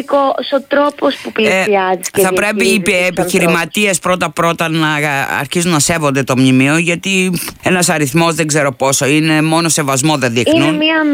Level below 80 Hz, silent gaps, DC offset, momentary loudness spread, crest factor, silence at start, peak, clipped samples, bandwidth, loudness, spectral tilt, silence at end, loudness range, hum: -48 dBFS; none; under 0.1%; 4 LU; 12 dB; 0 s; 0 dBFS; under 0.1%; 16.5 kHz; -12 LUFS; -4 dB/octave; 0 s; 1 LU; none